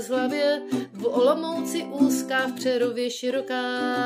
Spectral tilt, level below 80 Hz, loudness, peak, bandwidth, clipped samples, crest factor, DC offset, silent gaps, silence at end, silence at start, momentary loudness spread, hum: -3.5 dB/octave; -80 dBFS; -25 LUFS; -8 dBFS; 16 kHz; under 0.1%; 16 dB; under 0.1%; none; 0 s; 0 s; 6 LU; none